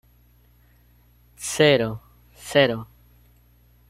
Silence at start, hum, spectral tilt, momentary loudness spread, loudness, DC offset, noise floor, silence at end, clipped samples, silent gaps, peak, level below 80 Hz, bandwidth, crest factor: 1.4 s; 60 Hz at -50 dBFS; -4 dB/octave; 22 LU; -21 LUFS; under 0.1%; -56 dBFS; 1.05 s; under 0.1%; none; -4 dBFS; -56 dBFS; 16 kHz; 22 dB